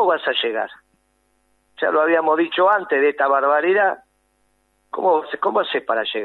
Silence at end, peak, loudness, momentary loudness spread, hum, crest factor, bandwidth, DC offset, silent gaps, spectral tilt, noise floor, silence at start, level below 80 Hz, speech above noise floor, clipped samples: 0 s; -4 dBFS; -19 LUFS; 7 LU; none; 16 dB; 4.3 kHz; under 0.1%; none; -5.5 dB/octave; -65 dBFS; 0 s; -72 dBFS; 46 dB; under 0.1%